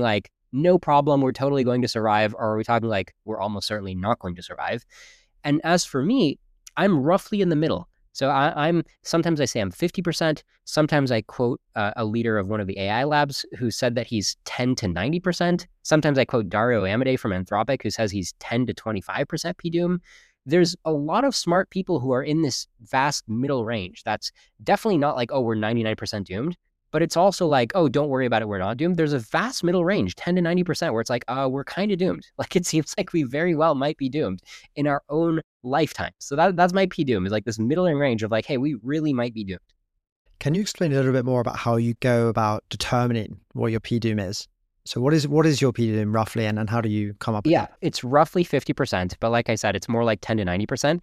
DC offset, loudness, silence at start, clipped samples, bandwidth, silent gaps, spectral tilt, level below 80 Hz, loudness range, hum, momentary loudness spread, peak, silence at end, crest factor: under 0.1%; -23 LUFS; 0 s; under 0.1%; 15 kHz; 35.44-35.60 s, 40.12-40.25 s; -5.5 dB/octave; -54 dBFS; 3 LU; none; 8 LU; -4 dBFS; 0.05 s; 18 dB